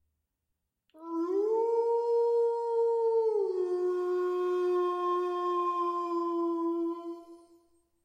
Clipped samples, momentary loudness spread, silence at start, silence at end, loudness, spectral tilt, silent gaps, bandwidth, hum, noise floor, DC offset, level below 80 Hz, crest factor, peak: under 0.1%; 7 LU; 0.95 s; 0.65 s; -30 LUFS; -4.5 dB/octave; none; 8.8 kHz; none; -84 dBFS; under 0.1%; -88 dBFS; 12 dB; -20 dBFS